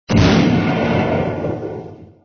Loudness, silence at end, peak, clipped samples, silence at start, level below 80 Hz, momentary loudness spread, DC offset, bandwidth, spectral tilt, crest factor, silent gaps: -16 LUFS; 0.2 s; -2 dBFS; under 0.1%; 0.1 s; -32 dBFS; 17 LU; under 0.1%; 6.8 kHz; -7 dB/octave; 16 dB; none